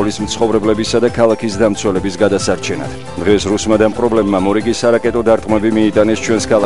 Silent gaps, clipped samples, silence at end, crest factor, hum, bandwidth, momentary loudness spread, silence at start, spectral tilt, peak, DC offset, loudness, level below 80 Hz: none; under 0.1%; 0 s; 14 dB; none; 11.5 kHz; 5 LU; 0 s; -5 dB/octave; 0 dBFS; 2%; -14 LUFS; -36 dBFS